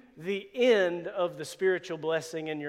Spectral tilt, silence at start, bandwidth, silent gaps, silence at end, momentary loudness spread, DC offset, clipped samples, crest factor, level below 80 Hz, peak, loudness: -4.5 dB/octave; 0.15 s; 14.5 kHz; none; 0 s; 11 LU; under 0.1%; under 0.1%; 18 dB; -76 dBFS; -12 dBFS; -29 LUFS